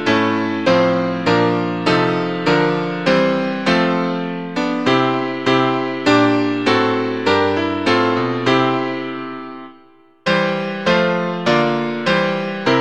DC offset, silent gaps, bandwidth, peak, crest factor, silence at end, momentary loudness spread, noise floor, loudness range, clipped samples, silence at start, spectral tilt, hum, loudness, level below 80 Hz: 0.4%; none; 9.4 kHz; 0 dBFS; 16 dB; 0 s; 6 LU; -49 dBFS; 3 LU; under 0.1%; 0 s; -6 dB/octave; none; -17 LUFS; -54 dBFS